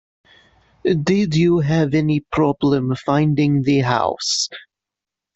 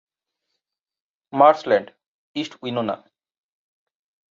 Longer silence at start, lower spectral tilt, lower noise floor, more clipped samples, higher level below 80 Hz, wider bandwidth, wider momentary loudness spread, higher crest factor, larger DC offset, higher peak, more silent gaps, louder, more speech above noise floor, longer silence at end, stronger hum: second, 0.85 s vs 1.35 s; about the same, -6 dB/octave vs -6 dB/octave; first, -86 dBFS vs -82 dBFS; neither; first, -48 dBFS vs -72 dBFS; about the same, 8.2 kHz vs 7.6 kHz; second, 5 LU vs 16 LU; second, 16 dB vs 22 dB; neither; about the same, -4 dBFS vs -2 dBFS; second, none vs 2.06-2.34 s; first, -18 LUFS vs -21 LUFS; first, 69 dB vs 62 dB; second, 0.75 s vs 1.35 s; neither